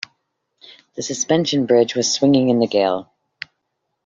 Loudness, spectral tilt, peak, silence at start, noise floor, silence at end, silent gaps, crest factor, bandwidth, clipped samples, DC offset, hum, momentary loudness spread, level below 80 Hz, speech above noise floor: -17 LUFS; -4.5 dB/octave; -2 dBFS; 0.95 s; -75 dBFS; 1 s; none; 18 dB; 7.8 kHz; under 0.1%; under 0.1%; none; 21 LU; -62 dBFS; 58 dB